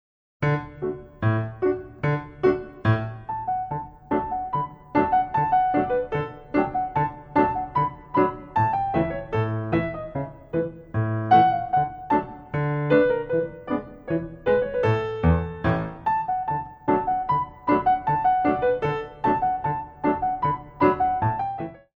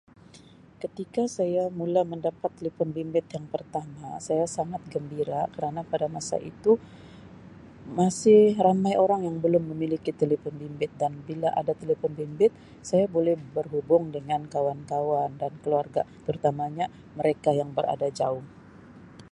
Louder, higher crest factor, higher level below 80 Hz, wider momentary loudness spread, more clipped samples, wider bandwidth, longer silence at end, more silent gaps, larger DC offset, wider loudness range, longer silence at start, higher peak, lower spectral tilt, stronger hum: first, -24 LUFS vs -27 LUFS; about the same, 18 dB vs 20 dB; first, -44 dBFS vs -62 dBFS; about the same, 8 LU vs 10 LU; neither; second, 6.6 kHz vs 11.5 kHz; about the same, 0.2 s vs 0.1 s; neither; neither; second, 3 LU vs 7 LU; about the same, 0.4 s vs 0.35 s; about the same, -6 dBFS vs -8 dBFS; first, -9.5 dB/octave vs -6.5 dB/octave; neither